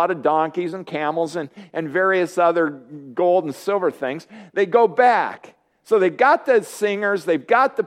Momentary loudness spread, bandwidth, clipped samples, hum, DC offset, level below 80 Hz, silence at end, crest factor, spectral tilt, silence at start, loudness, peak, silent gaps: 12 LU; 15.5 kHz; under 0.1%; none; under 0.1%; -76 dBFS; 0 s; 18 dB; -5.5 dB/octave; 0 s; -20 LUFS; -2 dBFS; none